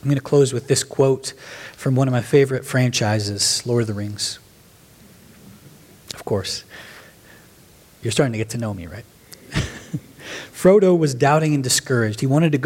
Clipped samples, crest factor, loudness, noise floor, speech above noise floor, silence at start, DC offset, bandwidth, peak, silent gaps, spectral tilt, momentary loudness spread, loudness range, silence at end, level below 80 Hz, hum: under 0.1%; 20 dB; -19 LUFS; -49 dBFS; 31 dB; 0.05 s; under 0.1%; 16.5 kHz; -2 dBFS; none; -5 dB/octave; 17 LU; 11 LU; 0 s; -50 dBFS; none